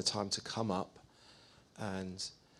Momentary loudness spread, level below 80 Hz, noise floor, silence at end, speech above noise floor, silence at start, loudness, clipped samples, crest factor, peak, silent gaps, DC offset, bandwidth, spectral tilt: 23 LU; -72 dBFS; -62 dBFS; 0.25 s; 23 dB; 0 s; -39 LUFS; under 0.1%; 22 dB; -18 dBFS; none; under 0.1%; 13.5 kHz; -3.5 dB/octave